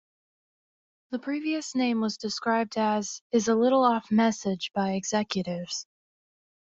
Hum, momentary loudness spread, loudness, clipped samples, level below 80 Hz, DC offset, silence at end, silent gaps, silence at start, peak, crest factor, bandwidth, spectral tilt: none; 10 LU; -27 LUFS; under 0.1%; -70 dBFS; under 0.1%; 0.9 s; 3.21-3.30 s; 1.1 s; -10 dBFS; 18 dB; 7.8 kHz; -4.5 dB/octave